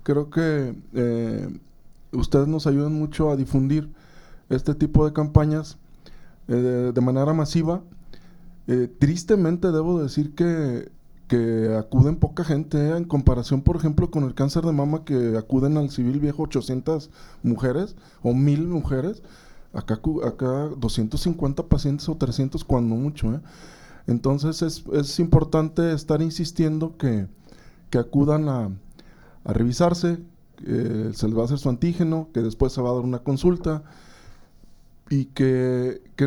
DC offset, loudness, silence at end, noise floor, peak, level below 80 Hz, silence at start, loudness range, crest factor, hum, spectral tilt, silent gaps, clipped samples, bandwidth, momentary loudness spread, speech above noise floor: under 0.1%; -23 LUFS; 0 s; -49 dBFS; -2 dBFS; -36 dBFS; 0 s; 3 LU; 20 dB; none; -8 dB/octave; none; under 0.1%; 12.5 kHz; 8 LU; 27 dB